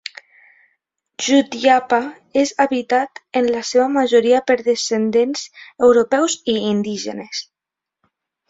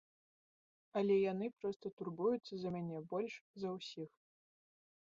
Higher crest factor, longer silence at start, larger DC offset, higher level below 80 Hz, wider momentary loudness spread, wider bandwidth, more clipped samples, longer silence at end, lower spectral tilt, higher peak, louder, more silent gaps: about the same, 16 dB vs 18 dB; first, 1.2 s vs 0.95 s; neither; first, -62 dBFS vs -82 dBFS; about the same, 12 LU vs 12 LU; about the same, 7.8 kHz vs 7.4 kHz; neither; about the same, 1.05 s vs 1 s; second, -3.5 dB/octave vs -6 dB/octave; first, -2 dBFS vs -24 dBFS; first, -17 LUFS vs -41 LUFS; second, none vs 1.76-1.80 s, 1.93-1.97 s, 3.41-3.54 s